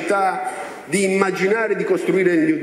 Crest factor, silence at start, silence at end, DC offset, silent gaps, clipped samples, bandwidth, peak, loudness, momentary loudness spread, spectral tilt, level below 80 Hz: 16 dB; 0 s; 0 s; under 0.1%; none; under 0.1%; 13 kHz; -4 dBFS; -19 LUFS; 8 LU; -5 dB/octave; -68 dBFS